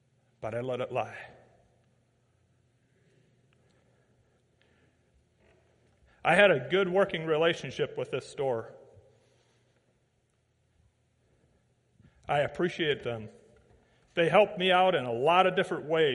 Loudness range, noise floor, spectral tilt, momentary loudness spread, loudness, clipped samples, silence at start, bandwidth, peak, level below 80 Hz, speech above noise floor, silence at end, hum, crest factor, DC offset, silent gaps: 13 LU; -73 dBFS; -5.5 dB/octave; 16 LU; -28 LUFS; under 0.1%; 0.4 s; 11.5 kHz; -6 dBFS; -68 dBFS; 45 dB; 0 s; none; 24 dB; under 0.1%; none